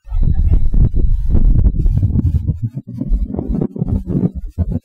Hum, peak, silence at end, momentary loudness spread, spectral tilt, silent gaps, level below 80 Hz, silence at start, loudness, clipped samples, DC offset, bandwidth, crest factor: none; -2 dBFS; 0.05 s; 7 LU; -12 dB/octave; none; -16 dBFS; 0.05 s; -18 LUFS; under 0.1%; under 0.1%; 1.7 kHz; 12 dB